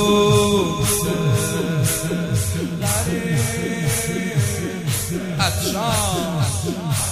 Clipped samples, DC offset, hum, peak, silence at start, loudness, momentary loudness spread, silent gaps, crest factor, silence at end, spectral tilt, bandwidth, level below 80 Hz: under 0.1%; under 0.1%; none; -4 dBFS; 0 s; -20 LUFS; 6 LU; none; 16 dB; 0 s; -4.5 dB/octave; 16 kHz; -40 dBFS